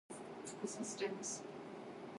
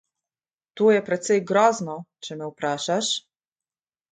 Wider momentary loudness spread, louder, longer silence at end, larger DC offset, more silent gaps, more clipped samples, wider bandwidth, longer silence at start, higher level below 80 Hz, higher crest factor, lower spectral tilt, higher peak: second, 9 LU vs 14 LU; second, -46 LUFS vs -22 LUFS; second, 0 s vs 0.95 s; neither; neither; neither; first, 11.5 kHz vs 9.4 kHz; second, 0.1 s vs 0.75 s; second, -86 dBFS vs -72 dBFS; about the same, 18 dB vs 20 dB; about the same, -3 dB/octave vs -3.5 dB/octave; second, -28 dBFS vs -6 dBFS